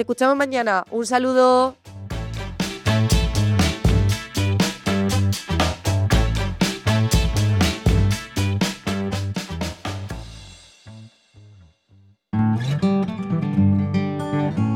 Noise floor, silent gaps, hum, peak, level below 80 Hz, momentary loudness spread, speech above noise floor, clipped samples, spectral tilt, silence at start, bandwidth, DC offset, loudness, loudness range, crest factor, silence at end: -54 dBFS; none; none; -4 dBFS; -30 dBFS; 10 LU; 35 dB; under 0.1%; -5.5 dB/octave; 0 s; 17.5 kHz; under 0.1%; -21 LUFS; 8 LU; 16 dB; 0 s